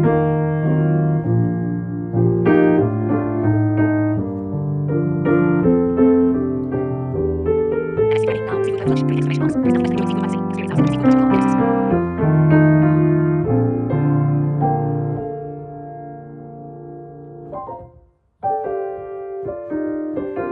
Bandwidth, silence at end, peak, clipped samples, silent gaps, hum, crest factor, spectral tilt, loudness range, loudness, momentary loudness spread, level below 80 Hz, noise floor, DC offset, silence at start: 9.2 kHz; 0 s; -2 dBFS; under 0.1%; none; none; 16 dB; -9.5 dB/octave; 12 LU; -18 LUFS; 17 LU; -46 dBFS; -51 dBFS; under 0.1%; 0 s